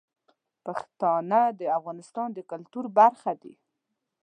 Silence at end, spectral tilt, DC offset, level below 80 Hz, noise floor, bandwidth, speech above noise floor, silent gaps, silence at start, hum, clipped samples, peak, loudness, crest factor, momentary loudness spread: 0.75 s; -7 dB/octave; under 0.1%; -86 dBFS; -82 dBFS; 9.6 kHz; 56 dB; none; 0.65 s; none; under 0.1%; -6 dBFS; -26 LUFS; 20 dB; 17 LU